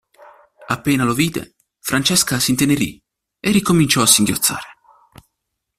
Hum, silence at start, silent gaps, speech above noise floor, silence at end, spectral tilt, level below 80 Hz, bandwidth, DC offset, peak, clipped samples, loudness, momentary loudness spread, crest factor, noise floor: none; 0.6 s; none; 60 dB; 1.05 s; -3 dB/octave; -48 dBFS; 16 kHz; under 0.1%; 0 dBFS; under 0.1%; -16 LUFS; 13 LU; 20 dB; -77 dBFS